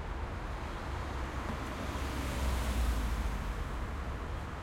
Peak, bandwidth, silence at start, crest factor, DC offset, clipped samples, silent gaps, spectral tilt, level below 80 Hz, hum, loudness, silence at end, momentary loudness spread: -22 dBFS; 16.5 kHz; 0 s; 14 dB; under 0.1%; under 0.1%; none; -5.5 dB/octave; -38 dBFS; none; -38 LUFS; 0 s; 6 LU